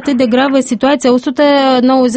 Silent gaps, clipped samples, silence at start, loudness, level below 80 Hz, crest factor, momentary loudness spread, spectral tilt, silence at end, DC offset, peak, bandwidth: none; under 0.1%; 0 s; -11 LUFS; -52 dBFS; 10 dB; 3 LU; -4 dB/octave; 0 s; under 0.1%; 0 dBFS; 8.8 kHz